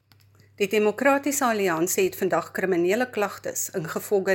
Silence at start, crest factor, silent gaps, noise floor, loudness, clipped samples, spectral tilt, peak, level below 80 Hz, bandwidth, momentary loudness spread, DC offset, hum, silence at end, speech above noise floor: 0.6 s; 18 dB; none; -57 dBFS; -24 LUFS; under 0.1%; -4 dB/octave; -8 dBFS; -70 dBFS; 17 kHz; 7 LU; under 0.1%; none; 0 s; 33 dB